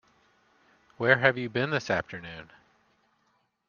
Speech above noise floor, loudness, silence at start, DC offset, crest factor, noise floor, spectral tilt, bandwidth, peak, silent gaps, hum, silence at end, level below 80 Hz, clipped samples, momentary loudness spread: 45 dB; -26 LUFS; 1 s; under 0.1%; 28 dB; -72 dBFS; -5.5 dB/octave; 7.2 kHz; -4 dBFS; none; none; 1.25 s; -68 dBFS; under 0.1%; 20 LU